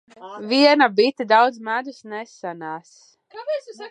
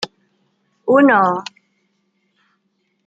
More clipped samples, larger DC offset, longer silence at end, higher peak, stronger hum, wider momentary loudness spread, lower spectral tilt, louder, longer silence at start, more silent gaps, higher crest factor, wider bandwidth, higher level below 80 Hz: neither; neither; second, 0 s vs 1.65 s; about the same, -2 dBFS vs -2 dBFS; neither; about the same, 19 LU vs 18 LU; second, -4 dB/octave vs -5.5 dB/octave; second, -19 LUFS vs -14 LUFS; first, 0.2 s vs 0 s; neither; about the same, 20 dB vs 18 dB; first, 10 kHz vs 8 kHz; second, -80 dBFS vs -70 dBFS